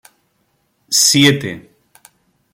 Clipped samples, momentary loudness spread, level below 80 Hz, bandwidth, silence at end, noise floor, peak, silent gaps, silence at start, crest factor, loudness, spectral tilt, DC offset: under 0.1%; 19 LU; -56 dBFS; 16.5 kHz; 0.95 s; -64 dBFS; 0 dBFS; none; 0.9 s; 18 dB; -12 LUFS; -2.5 dB/octave; under 0.1%